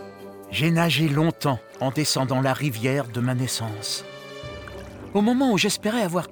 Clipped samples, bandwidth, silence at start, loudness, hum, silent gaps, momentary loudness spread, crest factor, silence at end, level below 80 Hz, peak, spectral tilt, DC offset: under 0.1%; over 20 kHz; 0 s; -23 LUFS; none; none; 17 LU; 18 dB; 0 s; -56 dBFS; -6 dBFS; -5 dB/octave; under 0.1%